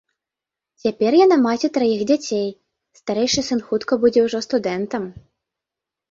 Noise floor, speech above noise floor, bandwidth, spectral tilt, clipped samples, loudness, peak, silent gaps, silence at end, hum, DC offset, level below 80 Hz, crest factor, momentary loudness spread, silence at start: -87 dBFS; 68 dB; 7.8 kHz; -4.5 dB/octave; under 0.1%; -19 LUFS; -4 dBFS; none; 0.9 s; none; under 0.1%; -58 dBFS; 16 dB; 12 LU; 0.85 s